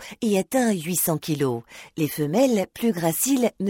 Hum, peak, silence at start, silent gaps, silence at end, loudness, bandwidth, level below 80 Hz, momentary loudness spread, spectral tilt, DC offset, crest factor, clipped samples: none; -8 dBFS; 0 s; none; 0 s; -23 LUFS; 17 kHz; -62 dBFS; 7 LU; -5 dB/octave; under 0.1%; 16 dB; under 0.1%